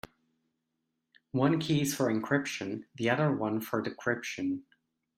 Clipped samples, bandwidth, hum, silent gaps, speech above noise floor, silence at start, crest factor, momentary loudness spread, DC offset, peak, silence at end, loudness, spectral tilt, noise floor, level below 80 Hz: under 0.1%; 16 kHz; none; none; 52 dB; 1.35 s; 20 dB; 9 LU; under 0.1%; -12 dBFS; 0.55 s; -31 LUFS; -5.5 dB/octave; -83 dBFS; -70 dBFS